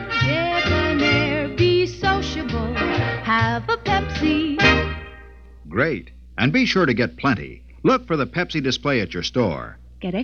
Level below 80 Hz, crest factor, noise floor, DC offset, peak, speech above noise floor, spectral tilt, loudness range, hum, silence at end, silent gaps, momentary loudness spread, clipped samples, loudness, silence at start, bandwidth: -36 dBFS; 18 dB; -42 dBFS; 0.2%; -2 dBFS; 22 dB; -6 dB/octave; 2 LU; none; 0 s; none; 11 LU; under 0.1%; -20 LUFS; 0 s; 7.4 kHz